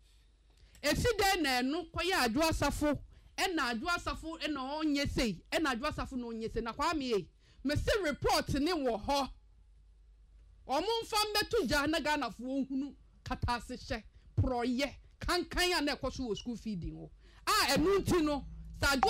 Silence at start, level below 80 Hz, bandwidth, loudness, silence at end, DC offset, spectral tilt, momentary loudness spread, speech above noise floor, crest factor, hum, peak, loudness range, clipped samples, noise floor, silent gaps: 0.75 s; -48 dBFS; 16 kHz; -33 LUFS; 0 s; under 0.1%; -4 dB/octave; 11 LU; 31 dB; 20 dB; none; -12 dBFS; 3 LU; under 0.1%; -63 dBFS; none